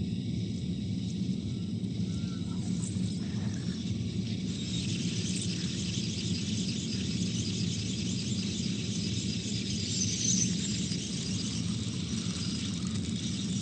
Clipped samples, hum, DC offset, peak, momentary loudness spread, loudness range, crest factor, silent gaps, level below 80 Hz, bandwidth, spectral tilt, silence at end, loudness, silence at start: under 0.1%; none; under 0.1%; -16 dBFS; 4 LU; 3 LU; 16 dB; none; -52 dBFS; 9.4 kHz; -4 dB/octave; 0 s; -32 LUFS; 0 s